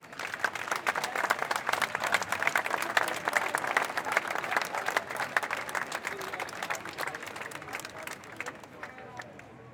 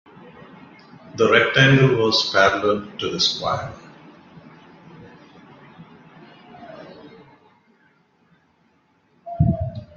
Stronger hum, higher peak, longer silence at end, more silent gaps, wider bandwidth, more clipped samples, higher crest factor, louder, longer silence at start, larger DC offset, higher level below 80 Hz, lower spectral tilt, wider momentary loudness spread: neither; second, -8 dBFS vs -2 dBFS; about the same, 0 s vs 0.1 s; neither; first, over 20 kHz vs 7.4 kHz; neither; about the same, 24 dB vs 22 dB; second, -31 LUFS vs -18 LUFS; second, 0 s vs 1.05 s; neither; second, -74 dBFS vs -48 dBFS; second, -1.5 dB/octave vs -5 dB/octave; second, 13 LU vs 26 LU